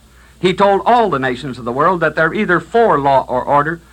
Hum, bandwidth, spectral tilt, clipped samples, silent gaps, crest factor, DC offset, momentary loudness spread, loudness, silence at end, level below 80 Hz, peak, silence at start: none; 12.5 kHz; -6.5 dB/octave; under 0.1%; none; 14 dB; under 0.1%; 7 LU; -14 LUFS; 0.15 s; -44 dBFS; 0 dBFS; 0.4 s